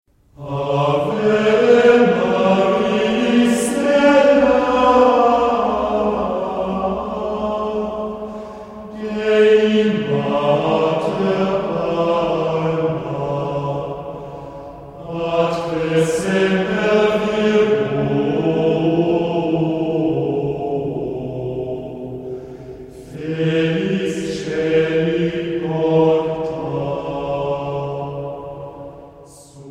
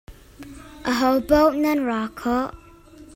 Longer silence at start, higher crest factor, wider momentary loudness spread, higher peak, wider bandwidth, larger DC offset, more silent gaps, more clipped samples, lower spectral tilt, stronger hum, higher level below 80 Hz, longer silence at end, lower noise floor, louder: first, 0.4 s vs 0.1 s; about the same, 16 dB vs 18 dB; second, 17 LU vs 22 LU; about the same, -2 dBFS vs -4 dBFS; second, 13 kHz vs 16.5 kHz; neither; neither; neither; first, -6.5 dB/octave vs -5 dB/octave; neither; about the same, -46 dBFS vs -44 dBFS; about the same, 0 s vs 0.1 s; second, -42 dBFS vs -46 dBFS; first, -18 LUFS vs -21 LUFS